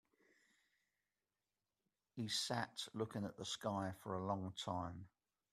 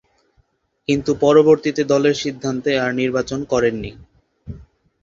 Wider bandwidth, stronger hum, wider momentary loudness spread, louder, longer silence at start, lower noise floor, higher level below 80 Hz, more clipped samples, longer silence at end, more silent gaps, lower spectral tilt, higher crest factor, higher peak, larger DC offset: first, 14.5 kHz vs 7.6 kHz; first, 50 Hz at -65 dBFS vs none; second, 10 LU vs 19 LU; second, -44 LUFS vs -18 LUFS; first, 2.15 s vs 0.9 s; first, under -90 dBFS vs -62 dBFS; second, -80 dBFS vs -48 dBFS; neither; about the same, 0.45 s vs 0.4 s; neither; second, -4 dB/octave vs -5.5 dB/octave; about the same, 22 dB vs 18 dB; second, -26 dBFS vs -2 dBFS; neither